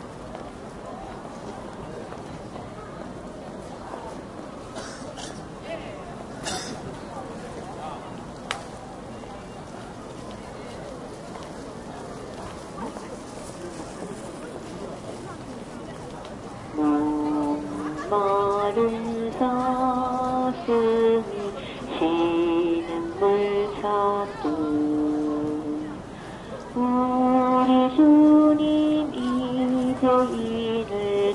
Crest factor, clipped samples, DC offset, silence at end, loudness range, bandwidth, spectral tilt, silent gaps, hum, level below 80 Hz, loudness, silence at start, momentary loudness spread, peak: 20 dB; under 0.1%; under 0.1%; 0 s; 17 LU; 11.5 kHz; -6 dB/octave; none; none; -52 dBFS; -24 LUFS; 0 s; 17 LU; -6 dBFS